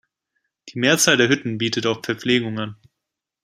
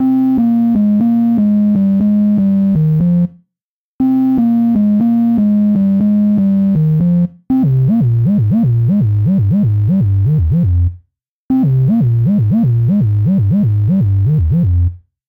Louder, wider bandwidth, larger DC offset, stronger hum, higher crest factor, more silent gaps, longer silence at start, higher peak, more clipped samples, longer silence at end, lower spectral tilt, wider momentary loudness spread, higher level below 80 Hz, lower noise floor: second, -19 LUFS vs -13 LUFS; first, 15.5 kHz vs 3.3 kHz; neither; neither; first, 20 dB vs 4 dB; second, none vs 3.62-3.99 s, 11.28-11.49 s; first, 0.65 s vs 0 s; first, -2 dBFS vs -6 dBFS; neither; first, 0.7 s vs 0.3 s; second, -3 dB/octave vs -12.5 dB/octave; first, 14 LU vs 2 LU; second, -64 dBFS vs -32 dBFS; about the same, -83 dBFS vs -84 dBFS